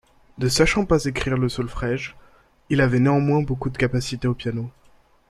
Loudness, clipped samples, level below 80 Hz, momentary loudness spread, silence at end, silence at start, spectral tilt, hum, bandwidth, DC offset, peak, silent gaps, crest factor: -22 LUFS; under 0.1%; -38 dBFS; 10 LU; 0.6 s; 0.35 s; -5.5 dB/octave; none; 13 kHz; under 0.1%; -2 dBFS; none; 20 dB